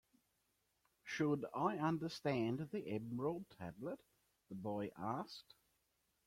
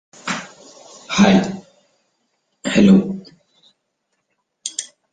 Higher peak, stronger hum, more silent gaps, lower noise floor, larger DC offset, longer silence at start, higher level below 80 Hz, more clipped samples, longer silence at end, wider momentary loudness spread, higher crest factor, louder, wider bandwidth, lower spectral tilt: second, -24 dBFS vs -2 dBFS; neither; neither; first, -83 dBFS vs -72 dBFS; neither; first, 1.05 s vs 0.25 s; second, -78 dBFS vs -52 dBFS; neither; first, 0.85 s vs 0.3 s; second, 13 LU vs 19 LU; about the same, 20 dB vs 18 dB; second, -43 LUFS vs -17 LUFS; first, 16 kHz vs 9.4 kHz; first, -7 dB/octave vs -5.5 dB/octave